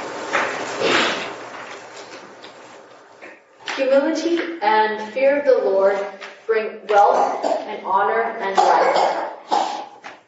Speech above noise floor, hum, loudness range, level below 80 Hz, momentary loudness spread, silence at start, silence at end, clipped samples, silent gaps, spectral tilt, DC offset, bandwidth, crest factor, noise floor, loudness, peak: 26 dB; none; 7 LU; -74 dBFS; 19 LU; 0 s; 0.1 s; under 0.1%; none; -3 dB/octave; under 0.1%; 8 kHz; 18 dB; -44 dBFS; -19 LUFS; -2 dBFS